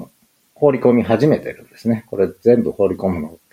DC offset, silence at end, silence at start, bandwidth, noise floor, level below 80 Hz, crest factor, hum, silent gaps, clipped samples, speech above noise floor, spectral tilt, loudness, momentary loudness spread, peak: under 0.1%; 0.2 s; 0 s; 15 kHz; -56 dBFS; -54 dBFS; 16 dB; none; none; under 0.1%; 39 dB; -8.5 dB/octave; -17 LUFS; 8 LU; -2 dBFS